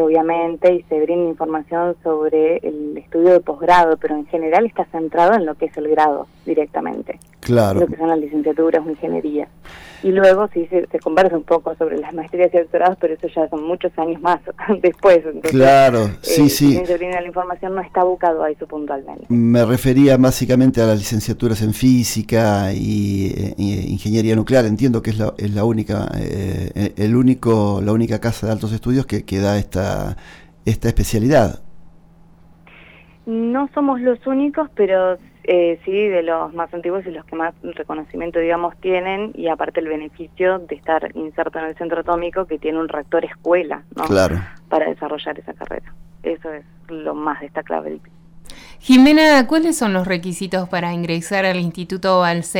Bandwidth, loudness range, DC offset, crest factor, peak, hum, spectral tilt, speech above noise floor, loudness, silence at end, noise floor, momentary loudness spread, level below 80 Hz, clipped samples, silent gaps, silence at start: 19.5 kHz; 7 LU; under 0.1%; 14 dB; -4 dBFS; none; -6 dB/octave; 30 dB; -17 LUFS; 0 s; -47 dBFS; 12 LU; -40 dBFS; under 0.1%; none; 0 s